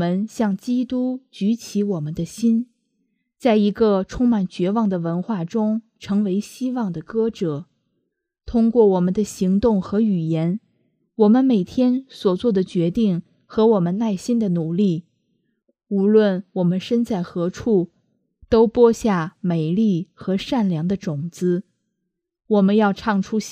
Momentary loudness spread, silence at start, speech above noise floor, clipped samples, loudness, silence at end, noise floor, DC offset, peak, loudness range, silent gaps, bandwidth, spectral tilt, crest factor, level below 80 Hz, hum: 9 LU; 0 s; 59 dB; under 0.1%; -20 LUFS; 0 s; -78 dBFS; under 0.1%; -2 dBFS; 4 LU; none; 14 kHz; -7.5 dB/octave; 18 dB; -50 dBFS; none